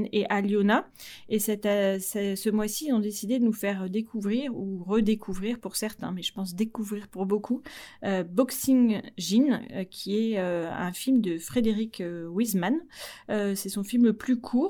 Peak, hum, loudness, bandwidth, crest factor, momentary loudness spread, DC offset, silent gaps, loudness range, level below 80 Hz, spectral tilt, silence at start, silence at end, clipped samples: -8 dBFS; none; -28 LUFS; 19.5 kHz; 18 dB; 9 LU; under 0.1%; none; 4 LU; -56 dBFS; -5 dB/octave; 0 s; 0 s; under 0.1%